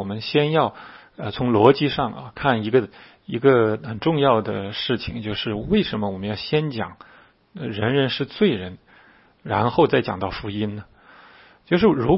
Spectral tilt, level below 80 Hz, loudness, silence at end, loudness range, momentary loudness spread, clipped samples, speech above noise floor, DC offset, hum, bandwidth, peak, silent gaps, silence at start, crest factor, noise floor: -10 dB/octave; -48 dBFS; -21 LUFS; 0 s; 5 LU; 14 LU; under 0.1%; 32 dB; under 0.1%; none; 5.8 kHz; 0 dBFS; none; 0 s; 22 dB; -53 dBFS